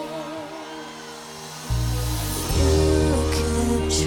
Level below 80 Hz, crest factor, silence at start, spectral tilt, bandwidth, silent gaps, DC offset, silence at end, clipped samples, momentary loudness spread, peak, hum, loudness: -28 dBFS; 14 dB; 0 s; -5 dB/octave; 19 kHz; none; under 0.1%; 0 s; under 0.1%; 16 LU; -8 dBFS; none; -23 LUFS